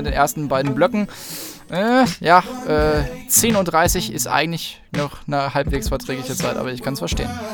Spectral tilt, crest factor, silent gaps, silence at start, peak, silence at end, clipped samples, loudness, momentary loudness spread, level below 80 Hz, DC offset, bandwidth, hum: -4 dB/octave; 20 dB; none; 0 s; 0 dBFS; 0 s; under 0.1%; -19 LUFS; 11 LU; -34 dBFS; under 0.1%; over 20 kHz; none